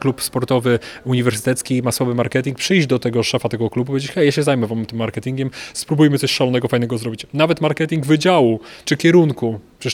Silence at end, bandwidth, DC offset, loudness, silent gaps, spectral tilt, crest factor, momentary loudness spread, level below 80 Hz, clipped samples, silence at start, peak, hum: 0 s; 18 kHz; under 0.1%; -18 LUFS; none; -5.5 dB/octave; 16 dB; 9 LU; -54 dBFS; under 0.1%; 0 s; -2 dBFS; none